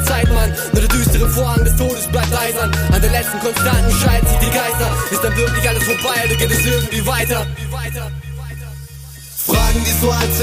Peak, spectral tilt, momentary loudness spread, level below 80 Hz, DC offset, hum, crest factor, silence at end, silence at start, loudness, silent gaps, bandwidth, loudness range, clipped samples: -2 dBFS; -4 dB/octave; 13 LU; -20 dBFS; under 0.1%; none; 14 dB; 0 s; 0 s; -16 LUFS; none; 15.5 kHz; 4 LU; under 0.1%